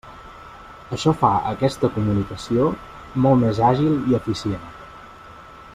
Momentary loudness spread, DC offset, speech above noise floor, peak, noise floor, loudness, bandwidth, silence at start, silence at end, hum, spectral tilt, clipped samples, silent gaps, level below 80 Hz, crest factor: 23 LU; under 0.1%; 22 dB; -2 dBFS; -42 dBFS; -20 LUFS; 13.5 kHz; 0.05 s; 0 s; none; -7.5 dB/octave; under 0.1%; none; -46 dBFS; 18 dB